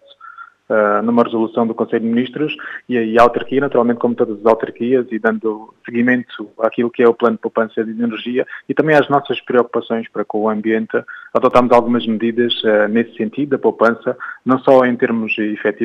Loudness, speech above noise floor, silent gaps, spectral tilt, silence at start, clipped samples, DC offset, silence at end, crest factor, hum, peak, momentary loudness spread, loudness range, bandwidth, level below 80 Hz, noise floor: -16 LUFS; 23 dB; none; -7 dB/octave; 0.25 s; under 0.1%; under 0.1%; 0 s; 16 dB; none; 0 dBFS; 9 LU; 2 LU; 7.4 kHz; -52 dBFS; -38 dBFS